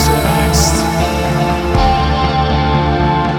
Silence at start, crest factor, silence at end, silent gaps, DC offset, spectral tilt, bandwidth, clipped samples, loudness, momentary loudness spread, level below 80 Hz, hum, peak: 0 s; 12 dB; 0 s; none; under 0.1%; -5 dB/octave; 17.5 kHz; under 0.1%; -13 LUFS; 3 LU; -20 dBFS; none; 0 dBFS